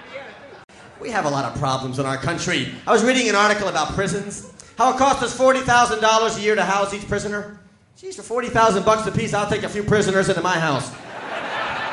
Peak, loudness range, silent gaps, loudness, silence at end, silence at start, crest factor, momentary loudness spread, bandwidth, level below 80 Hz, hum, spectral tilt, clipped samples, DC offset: -4 dBFS; 3 LU; none; -20 LUFS; 0 s; 0 s; 18 dB; 16 LU; 11.5 kHz; -46 dBFS; none; -4 dB/octave; under 0.1%; under 0.1%